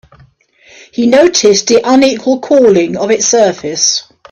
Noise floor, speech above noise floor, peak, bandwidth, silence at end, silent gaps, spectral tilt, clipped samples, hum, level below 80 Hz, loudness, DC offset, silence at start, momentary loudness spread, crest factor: -46 dBFS; 36 dB; 0 dBFS; 9.6 kHz; 0.3 s; none; -3 dB/octave; under 0.1%; none; -52 dBFS; -9 LUFS; under 0.1%; 1 s; 7 LU; 10 dB